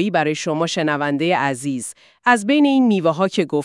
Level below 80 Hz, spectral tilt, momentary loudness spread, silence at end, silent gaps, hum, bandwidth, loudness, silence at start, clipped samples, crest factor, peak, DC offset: -72 dBFS; -5 dB/octave; 9 LU; 0 s; none; none; 12 kHz; -18 LUFS; 0 s; under 0.1%; 16 dB; -2 dBFS; under 0.1%